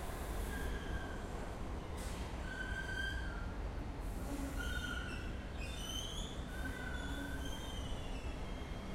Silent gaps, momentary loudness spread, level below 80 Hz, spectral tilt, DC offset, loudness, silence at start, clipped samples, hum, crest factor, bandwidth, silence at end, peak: none; 4 LU; -44 dBFS; -4.5 dB/octave; under 0.1%; -44 LUFS; 0 s; under 0.1%; none; 14 dB; 16 kHz; 0 s; -28 dBFS